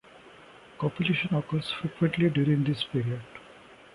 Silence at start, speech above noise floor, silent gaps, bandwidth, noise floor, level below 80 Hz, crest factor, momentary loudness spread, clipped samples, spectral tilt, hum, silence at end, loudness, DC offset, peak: 0.15 s; 25 dB; none; 11.5 kHz; -52 dBFS; -60 dBFS; 16 dB; 10 LU; under 0.1%; -7.5 dB/octave; none; 0.2 s; -28 LUFS; under 0.1%; -12 dBFS